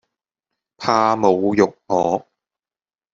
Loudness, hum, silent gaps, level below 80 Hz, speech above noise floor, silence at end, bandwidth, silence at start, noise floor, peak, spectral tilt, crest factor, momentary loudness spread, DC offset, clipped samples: -18 LUFS; none; none; -60 dBFS; over 73 dB; 0.95 s; 7.6 kHz; 0.8 s; under -90 dBFS; -2 dBFS; -5.5 dB/octave; 18 dB; 7 LU; under 0.1%; under 0.1%